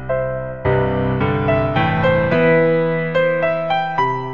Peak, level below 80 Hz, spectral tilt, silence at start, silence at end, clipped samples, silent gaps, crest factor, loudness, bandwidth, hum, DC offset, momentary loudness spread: -4 dBFS; -38 dBFS; -9 dB/octave; 0 s; 0 s; under 0.1%; none; 14 dB; -17 LUFS; 6.6 kHz; none; 1%; 5 LU